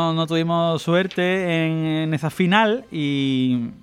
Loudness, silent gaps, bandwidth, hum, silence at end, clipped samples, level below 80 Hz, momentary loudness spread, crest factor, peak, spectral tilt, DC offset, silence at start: -20 LUFS; none; 14 kHz; none; 0.05 s; under 0.1%; -60 dBFS; 5 LU; 16 dB; -4 dBFS; -6.5 dB/octave; under 0.1%; 0 s